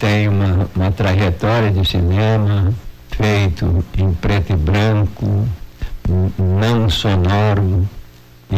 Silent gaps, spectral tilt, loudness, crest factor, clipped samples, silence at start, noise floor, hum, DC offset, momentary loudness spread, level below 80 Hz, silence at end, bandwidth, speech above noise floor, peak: none; -7 dB/octave; -16 LUFS; 6 dB; under 0.1%; 0 s; -40 dBFS; none; under 0.1%; 5 LU; -24 dBFS; 0 s; 15 kHz; 25 dB; -10 dBFS